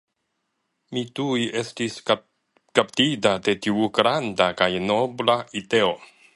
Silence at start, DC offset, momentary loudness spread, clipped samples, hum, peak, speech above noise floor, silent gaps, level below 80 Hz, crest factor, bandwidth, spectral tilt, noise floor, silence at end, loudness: 0.9 s; under 0.1%; 8 LU; under 0.1%; none; 0 dBFS; 54 dB; none; -60 dBFS; 22 dB; 11.5 kHz; -4.5 dB/octave; -76 dBFS; 0.3 s; -23 LUFS